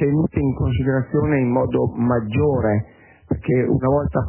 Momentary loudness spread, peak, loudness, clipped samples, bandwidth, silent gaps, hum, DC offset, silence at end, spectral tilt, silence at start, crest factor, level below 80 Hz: 4 LU; -6 dBFS; -20 LUFS; under 0.1%; 3.2 kHz; none; none; under 0.1%; 0 s; -13 dB/octave; 0 s; 14 dB; -34 dBFS